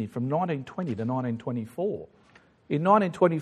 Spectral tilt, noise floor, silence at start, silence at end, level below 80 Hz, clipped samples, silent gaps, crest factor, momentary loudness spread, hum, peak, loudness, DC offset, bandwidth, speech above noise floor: -8.5 dB/octave; -58 dBFS; 0 s; 0 s; -68 dBFS; under 0.1%; none; 20 dB; 11 LU; none; -8 dBFS; -27 LUFS; under 0.1%; 12.5 kHz; 32 dB